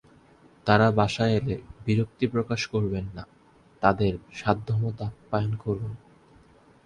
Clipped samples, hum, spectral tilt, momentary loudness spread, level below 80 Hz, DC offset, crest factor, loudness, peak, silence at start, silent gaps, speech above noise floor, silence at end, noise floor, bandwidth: under 0.1%; none; -7 dB/octave; 11 LU; -50 dBFS; under 0.1%; 22 dB; -26 LUFS; -4 dBFS; 0.65 s; none; 31 dB; 0.9 s; -56 dBFS; 9.6 kHz